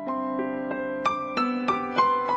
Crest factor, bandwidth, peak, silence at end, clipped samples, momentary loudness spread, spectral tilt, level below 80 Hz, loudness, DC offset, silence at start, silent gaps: 18 dB; 8 kHz; -8 dBFS; 0 s; under 0.1%; 7 LU; -5.5 dB/octave; -64 dBFS; -26 LUFS; under 0.1%; 0 s; none